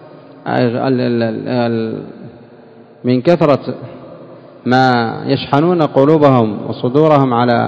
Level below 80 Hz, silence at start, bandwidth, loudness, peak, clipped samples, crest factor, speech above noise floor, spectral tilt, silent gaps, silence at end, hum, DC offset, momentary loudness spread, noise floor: -54 dBFS; 0 s; 8 kHz; -14 LUFS; 0 dBFS; 0.6%; 14 dB; 27 dB; -8.5 dB/octave; none; 0 s; none; under 0.1%; 15 LU; -40 dBFS